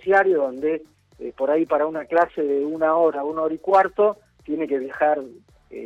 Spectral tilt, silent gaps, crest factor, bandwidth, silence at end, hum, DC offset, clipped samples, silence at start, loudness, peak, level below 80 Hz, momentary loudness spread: -7 dB/octave; none; 16 dB; 8 kHz; 0 s; none; under 0.1%; under 0.1%; 0.05 s; -22 LUFS; -6 dBFS; -62 dBFS; 12 LU